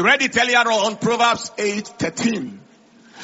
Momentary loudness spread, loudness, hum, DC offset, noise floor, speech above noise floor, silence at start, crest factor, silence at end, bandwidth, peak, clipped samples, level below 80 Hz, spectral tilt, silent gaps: 10 LU; -18 LUFS; none; under 0.1%; -50 dBFS; 31 dB; 0 s; 18 dB; 0 s; 8.2 kHz; -2 dBFS; under 0.1%; -62 dBFS; -3 dB/octave; none